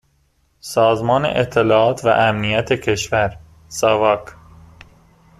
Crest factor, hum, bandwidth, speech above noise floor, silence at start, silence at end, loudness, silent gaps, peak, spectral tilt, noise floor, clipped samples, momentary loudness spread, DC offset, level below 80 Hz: 18 dB; none; 14.5 kHz; 44 dB; 0.65 s; 1.05 s; -17 LUFS; none; 0 dBFS; -5 dB/octave; -61 dBFS; under 0.1%; 8 LU; under 0.1%; -46 dBFS